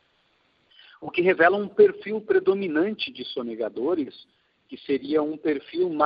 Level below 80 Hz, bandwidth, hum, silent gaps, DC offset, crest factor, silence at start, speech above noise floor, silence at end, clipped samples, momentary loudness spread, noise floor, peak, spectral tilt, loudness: -70 dBFS; 5.2 kHz; none; none; under 0.1%; 20 dB; 1 s; 43 dB; 0 s; under 0.1%; 13 LU; -66 dBFS; -6 dBFS; -9 dB/octave; -24 LUFS